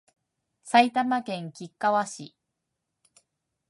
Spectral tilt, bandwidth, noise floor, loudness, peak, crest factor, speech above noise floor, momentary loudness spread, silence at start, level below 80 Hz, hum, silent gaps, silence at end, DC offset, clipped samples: -4 dB/octave; 11.5 kHz; -82 dBFS; -25 LUFS; -6 dBFS; 24 dB; 57 dB; 20 LU; 0.65 s; -84 dBFS; none; none; 1.4 s; under 0.1%; under 0.1%